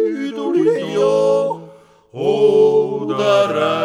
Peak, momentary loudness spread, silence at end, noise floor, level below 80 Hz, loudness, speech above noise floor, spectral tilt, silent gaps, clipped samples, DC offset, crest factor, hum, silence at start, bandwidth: -4 dBFS; 9 LU; 0 s; -44 dBFS; -70 dBFS; -16 LUFS; 27 dB; -6 dB/octave; none; under 0.1%; under 0.1%; 12 dB; none; 0 s; 10.5 kHz